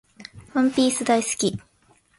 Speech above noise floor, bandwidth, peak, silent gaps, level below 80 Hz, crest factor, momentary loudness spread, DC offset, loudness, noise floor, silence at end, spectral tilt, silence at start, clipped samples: 39 dB; 11.5 kHz; -8 dBFS; none; -58 dBFS; 18 dB; 21 LU; under 0.1%; -22 LUFS; -60 dBFS; 0.6 s; -3.5 dB/octave; 0.2 s; under 0.1%